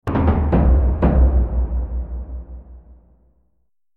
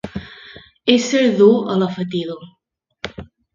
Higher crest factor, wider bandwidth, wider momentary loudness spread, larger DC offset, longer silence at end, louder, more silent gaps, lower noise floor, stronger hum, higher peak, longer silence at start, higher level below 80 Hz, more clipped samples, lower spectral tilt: about the same, 16 dB vs 18 dB; second, 3.3 kHz vs 7.6 kHz; about the same, 19 LU vs 21 LU; neither; first, 1.15 s vs 0.3 s; second, -19 LUFS vs -16 LUFS; neither; first, -70 dBFS vs -42 dBFS; neither; about the same, -2 dBFS vs 0 dBFS; about the same, 0.05 s vs 0.05 s; first, -20 dBFS vs -50 dBFS; neither; first, -11 dB/octave vs -5 dB/octave